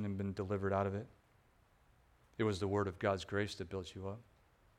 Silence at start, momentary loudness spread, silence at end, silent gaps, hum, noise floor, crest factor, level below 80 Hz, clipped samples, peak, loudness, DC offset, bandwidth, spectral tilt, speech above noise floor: 0 s; 12 LU; 0.55 s; none; none; -70 dBFS; 22 dB; -68 dBFS; under 0.1%; -20 dBFS; -39 LUFS; under 0.1%; 11.5 kHz; -6.5 dB/octave; 32 dB